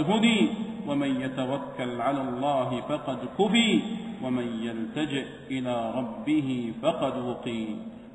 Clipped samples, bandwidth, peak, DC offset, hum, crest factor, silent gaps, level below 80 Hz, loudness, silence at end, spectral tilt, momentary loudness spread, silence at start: under 0.1%; 9.8 kHz; -10 dBFS; under 0.1%; none; 18 dB; none; -62 dBFS; -28 LUFS; 0 s; -5.5 dB/octave; 11 LU; 0 s